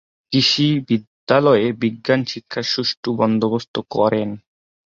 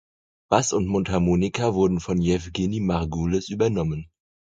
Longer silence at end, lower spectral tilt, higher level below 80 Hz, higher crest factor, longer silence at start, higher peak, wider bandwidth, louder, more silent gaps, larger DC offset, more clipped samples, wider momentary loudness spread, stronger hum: about the same, 0.5 s vs 0.5 s; about the same, -5.5 dB/octave vs -6 dB/octave; second, -58 dBFS vs -40 dBFS; about the same, 18 dB vs 22 dB; second, 0.3 s vs 0.5 s; about the same, -2 dBFS vs -2 dBFS; second, 7.6 kHz vs 9.2 kHz; first, -19 LUFS vs -23 LUFS; first, 1.07-1.27 s, 2.97-3.03 s, 3.68-3.74 s vs none; neither; neither; first, 10 LU vs 5 LU; neither